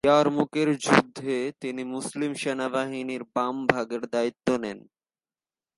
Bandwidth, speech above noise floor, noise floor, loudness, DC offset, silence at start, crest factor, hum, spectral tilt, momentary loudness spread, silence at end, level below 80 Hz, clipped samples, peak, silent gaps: 11.5 kHz; over 64 dB; under -90 dBFS; -26 LUFS; under 0.1%; 0.05 s; 26 dB; none; -5 dB/octave; 11 LU; 1 s; -64 dBFS; under 0.1%; 0 dBFS; none